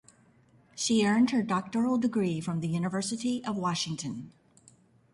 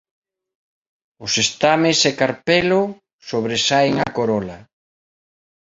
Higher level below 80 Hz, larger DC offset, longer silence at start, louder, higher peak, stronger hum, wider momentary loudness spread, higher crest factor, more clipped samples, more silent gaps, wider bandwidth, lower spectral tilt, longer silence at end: second, -68 dBFS vs -54 dBFS; neither; second, 0.75 s vs 1.2 s; second, -29 LUFS vs -18 LUFS; second, -16 dBFS vs -2 dBFS; neither; about the same, 10 LU vs 11 LU; about the same, 14 dB vs 18 dB; neither; second, none vs 3.13-3.19 s; first, 11.5 kHz vs 8 kHz; first, -5 dB/octave vs -3.5 dB/octave; second, 0.85 s vs 1 s